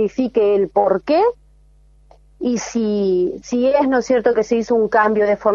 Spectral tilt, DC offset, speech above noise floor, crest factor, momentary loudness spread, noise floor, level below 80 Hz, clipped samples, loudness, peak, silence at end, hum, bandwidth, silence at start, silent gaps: -5.5 dB/octave; under 0.1%; 34 dB; 16 dB; 5 LU; -50 dBFS; -50 dBFS; under 0.1%; -17 LUFS; -2 dBFS; 0 s; none; 7.6 kHz; 0 s; none